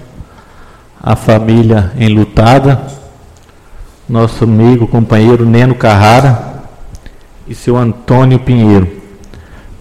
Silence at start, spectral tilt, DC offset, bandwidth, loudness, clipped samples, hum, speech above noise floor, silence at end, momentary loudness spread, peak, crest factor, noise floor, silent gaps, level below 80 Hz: 0 s; -8 dB/octave; under 0.1%; 12 kHz; -8 LUFS; 0.5%; none; 31 dB; 0.05 s; 11 LU; 0 dBFS; 10 dB; -37 dBFS; none; -30 dBFS